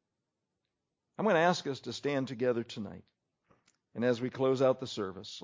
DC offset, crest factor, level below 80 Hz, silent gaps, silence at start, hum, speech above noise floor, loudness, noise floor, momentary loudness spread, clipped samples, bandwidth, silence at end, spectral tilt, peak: under 0.1%; 20 dB; -72 dBFS; none; 1.2 s; none; 55 dB; -32 LUFS; -86 dBFS; 15 LU; under 0.1%; 7.6 kHz; 0 s; -5.5 dB/octave; -14 dBFS